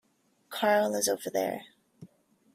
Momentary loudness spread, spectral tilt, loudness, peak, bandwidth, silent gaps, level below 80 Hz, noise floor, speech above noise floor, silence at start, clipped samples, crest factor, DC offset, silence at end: 14 LU; -2.5 dB/octave; -28 LUFS; -10 dBFS; 16 kHz; none; -78 dBFS; -61 dBFS; 32 dB; 0.5 s; under 0.1%; 22 dB; under 0.1%; 0.5 s